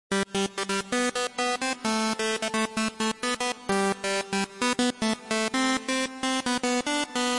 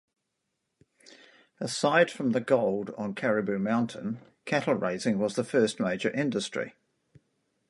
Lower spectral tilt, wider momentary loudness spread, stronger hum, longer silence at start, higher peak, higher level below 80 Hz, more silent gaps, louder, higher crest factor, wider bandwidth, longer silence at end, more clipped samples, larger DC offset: second, -2.5 dB/octave vs -5 dB/octave; second, 3 LU vs 11 LU; neither; second, 0.1 s vs 1.6 s; about the same, -10 dBFS vs -8 dBFS; first, -62 dBFS vs -72 dBFS; neither; about the same, -27 LUFS vs -28 LUFS; about the same, 18 dB vs 22 dB; about the same, 11.5 kHz vs 11.5 kHz; second, 0 s vs 1 s; neither; neither